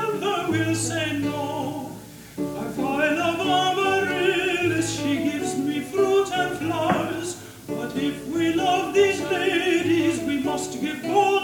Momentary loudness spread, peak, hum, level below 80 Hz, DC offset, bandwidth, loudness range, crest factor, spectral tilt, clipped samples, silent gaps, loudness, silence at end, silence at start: 10 LU; -6 dBFS; none; -56 dBFS; under 0.1%; 19 kHz; 3 LU; 16 dB; -4.5 dB/octave; under 0.1%; none; -23 LUFS; 0 s; 0 s